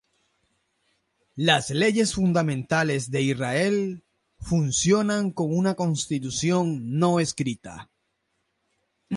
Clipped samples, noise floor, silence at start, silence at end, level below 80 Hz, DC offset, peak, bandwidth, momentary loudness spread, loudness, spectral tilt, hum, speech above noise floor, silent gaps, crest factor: under 0.1%; -75 dBFS; 1.35 s; 0 s; -54 dBFS; under 0.1%; -6 dBFS; 11.5 kHz; 10 LU; -24 LUFS; -5 dB/octave; none; 51 dB; none; 18 dB